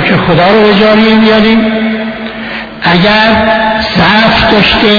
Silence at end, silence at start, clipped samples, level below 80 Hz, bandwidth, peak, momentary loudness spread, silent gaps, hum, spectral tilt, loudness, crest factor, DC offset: 0 s; 0 s; 1%; -30 dBFS; 5.4 kHz; 0 dBFS; 11 LU; none; none; -6.5 dB/octave; -6 LUFS; 6 dB; under 0.1%